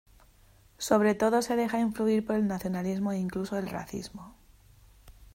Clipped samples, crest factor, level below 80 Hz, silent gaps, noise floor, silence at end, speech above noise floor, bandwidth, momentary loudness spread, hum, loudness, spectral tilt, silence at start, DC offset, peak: under 0.1%; 20 dB; -58 dBFS; none; -59 dBFS; 0.1 s; 31 dB; 16 kHz; 14 LU; none; -29 LUFS; -6 dB/octave; 0.8 s; under 0.1%; -10 dBFS